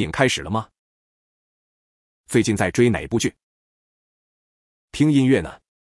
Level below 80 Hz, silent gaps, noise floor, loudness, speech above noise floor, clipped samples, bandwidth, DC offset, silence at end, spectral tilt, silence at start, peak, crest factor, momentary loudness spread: -50 dBFS; 0.78-2.24 s, 3.43-4.88 s; under -90 dBFS; -20 LUFS; over 71 dB; under 0.1%; 12 kHz; under 0.1%; 0.4 s; -5.5 dB/octave; 0 s; -2 dBFS; 22 dB; 10 LU